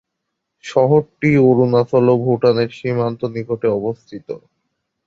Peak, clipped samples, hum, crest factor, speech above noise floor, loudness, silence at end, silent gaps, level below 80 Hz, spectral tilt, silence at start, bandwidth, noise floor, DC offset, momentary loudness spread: -2 dBFS; under 0.1%; none; 16 dB; 61 dB; -16 LUFS; 0.7 s; none; -54 dBFS; -8.5 dB/octave; 0.65 s; 7.6 kHz; -77 dBFS; under 0.1%; 18 LU